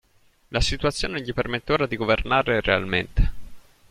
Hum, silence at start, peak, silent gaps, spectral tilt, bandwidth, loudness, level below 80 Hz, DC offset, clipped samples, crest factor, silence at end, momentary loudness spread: none; 0.5 s; -4 dBFS; none; -5 dB/octave; 13 kHz; -24 LUFS; -32 dBFS; under 0.1%; under 0.1%; 20 dB; 0.3 s; 7 LU